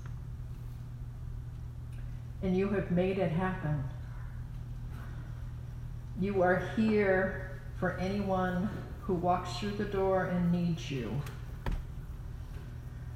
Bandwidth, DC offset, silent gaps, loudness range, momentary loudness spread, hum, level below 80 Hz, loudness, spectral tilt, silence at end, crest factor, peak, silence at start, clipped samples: 15 kHz; under 0.1%; none; 4 LU; 15 LU; none; -44 dBFS; -34 LUFS; -7.5 dB/octave; 0 s; 18 dB; -16 dBFS; 0 s; under 0.1%